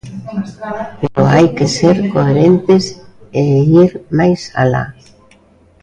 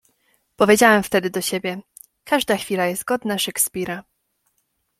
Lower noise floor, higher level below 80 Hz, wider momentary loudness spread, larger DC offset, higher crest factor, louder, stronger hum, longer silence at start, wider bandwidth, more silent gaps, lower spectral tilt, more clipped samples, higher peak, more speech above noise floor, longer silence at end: second, -48 dBFS vs -71 dBFS; first, -44 dBFS vs -58 dBFS; about the same, 14 LU vs 15 LU; neither; second, 12 dB vs 20 dB; first, -12 LUFS vs -19 LUFS; neither; second, 0.05 s vs 0.6 s; second, 9.8 kHz vs 16.5 kHz; neither; first, -7 dB/octave vs -3 dB/octave; neither; about the same, 0 dBFS vs -2 dBFS; second, 36 dB vs 51 dB; about the same, 0.9 s vs 1 s